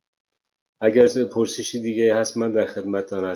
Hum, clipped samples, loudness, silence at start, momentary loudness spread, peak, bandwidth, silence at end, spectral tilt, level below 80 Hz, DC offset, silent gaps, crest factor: none; under 0.1%; -21 LUFS; 0.8 s; 9 LU; -4 dBFS; 18 kHz; 0 s; -4.5 dB/octave; -64 dBFS; under 0.1%; none; 18 dB